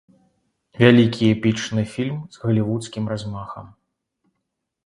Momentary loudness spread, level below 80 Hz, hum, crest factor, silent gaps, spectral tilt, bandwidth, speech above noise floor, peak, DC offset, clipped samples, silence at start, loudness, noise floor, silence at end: 17 LU; -54 dBFS; none; 22 dB; none; -6.5 dB/octave; 11 kHz; 59 dB; 0 dBFS; under 0.1%; under 0.1%; 0.75 s; -20 LUFS; -78 dBFS; 1.2 s